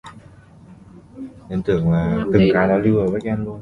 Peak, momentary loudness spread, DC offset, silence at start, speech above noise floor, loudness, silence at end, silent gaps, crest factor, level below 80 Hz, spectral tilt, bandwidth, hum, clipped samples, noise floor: -2 dBFS; 19 LU; under 0.1%; 0.05 s; 27 dB; -18 LUFS; 0 s; none; 18 dB; -40 dBFS; -9 dB/octave; 7.4 kHz; none; under 0.1%; -45 dBFS